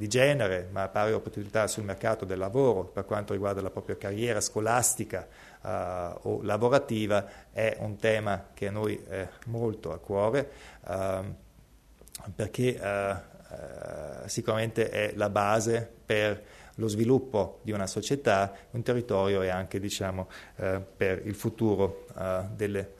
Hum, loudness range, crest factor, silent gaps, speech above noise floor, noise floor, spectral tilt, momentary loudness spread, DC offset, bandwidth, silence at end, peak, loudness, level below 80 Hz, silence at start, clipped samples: none; 5 LU; 22 dB; none; 27 dB; -57 dBFS; -5 dB/octave; 13 LU; under 0.1%; 13.5 kHz; 0.05 s; -8 dBFS; -30 LUFS; -58 dBFS; 0 s; under 0.1%